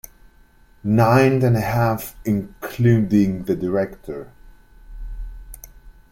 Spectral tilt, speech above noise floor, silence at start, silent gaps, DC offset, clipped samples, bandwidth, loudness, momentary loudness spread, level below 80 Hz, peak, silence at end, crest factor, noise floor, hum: -8 dB/octave; 33 dB; 0.85 s; none; under 0.1%; under 0.1%; 16.5 kHz; -19 LUFS; 23 LU; -40 dBFS; -2 dBFS; 0.2 s; 18 dB; -51 dBFS; none